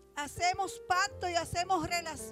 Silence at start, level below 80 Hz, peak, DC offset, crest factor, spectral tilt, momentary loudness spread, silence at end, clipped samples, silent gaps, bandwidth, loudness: 0.15 s; -56 dBFS; -18 dBFS; under 0.1%; 16 dB; -2.5 dB/octave; 4 LU; 0 s; under 0.1%; none; 16 kHz; -33 LUFS